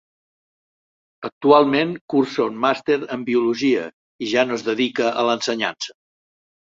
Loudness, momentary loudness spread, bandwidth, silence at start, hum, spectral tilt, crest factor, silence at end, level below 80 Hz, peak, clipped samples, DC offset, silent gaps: -20 LUFS; 16 LU; 7.8 kHz; 1.2 s; none; -4.5 dB/octave; 20 dB; 0.85 s; -66 dBFS; -2 dBFS; under 0.1%; under 0.1%; 1.32-1.41 s, 2.01-2.08 s, 3.93-4.19 s